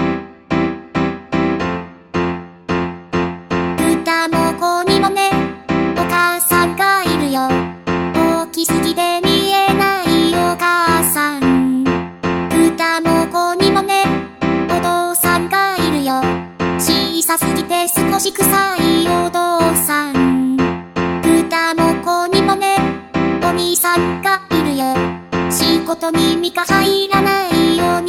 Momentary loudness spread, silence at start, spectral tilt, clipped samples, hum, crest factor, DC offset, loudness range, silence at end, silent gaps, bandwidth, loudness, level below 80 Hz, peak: 7 LU; 0 s; -4 dB/octave; under 0.1%; none; 14 dB; under 0.1%; 2 LU; 0 s; none; 17.5 kHz; -15 LUFS; -44 dBFS; 0 dBFS